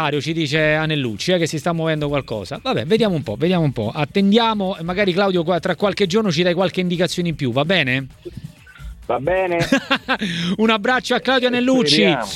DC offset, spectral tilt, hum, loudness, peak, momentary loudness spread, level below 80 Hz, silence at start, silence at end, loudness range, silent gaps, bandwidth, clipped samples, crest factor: under 0.1%; -5.5 dB/octave; none; -18 LUFS; -2 dBFS; 7 LU; -46 dBFS; 0 s; 0 s; 2 LU; none; 14.5 kHz; under 0.1%; 18 dB